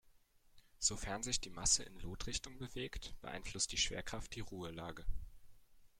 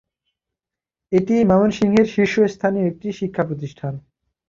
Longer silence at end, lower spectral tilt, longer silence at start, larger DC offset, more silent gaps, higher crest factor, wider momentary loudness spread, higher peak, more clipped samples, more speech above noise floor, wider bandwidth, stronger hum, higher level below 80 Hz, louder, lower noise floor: second, 0.15 s vs 0.5 s; second, -1.5 dB/octave vs -7.5 dB/octave; second, 0.55 s vs 1.1 s; neither; neither; first, 24 dB vs 18 dB; about the same, 15 LU vs 13 LU; second, -18 dBFS vs -2 dBFS; neither; second, 27 dB vs 69 dB; first, 16 kHz vs 7.4 kHz; neither; about the same, -52 dBFS vs -52 dBFS; second, -40 LUFS vs -19 LUFS; second, -68 dBFS vs -87 dBFS